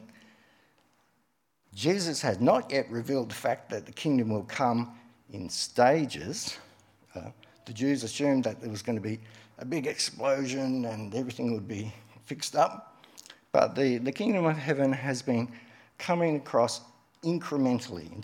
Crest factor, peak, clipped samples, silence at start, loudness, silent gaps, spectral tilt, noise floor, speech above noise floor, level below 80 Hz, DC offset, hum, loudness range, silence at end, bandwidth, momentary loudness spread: 22 dB; -8 dBFS; under 0.1%; 0 s; -29 LUFS; none; -5 dB/octave; -75 dBFS; 46 dB; -74 dBFS; under 0.1%; none; 4 LU; 0 s; 17 kHz; 16 LU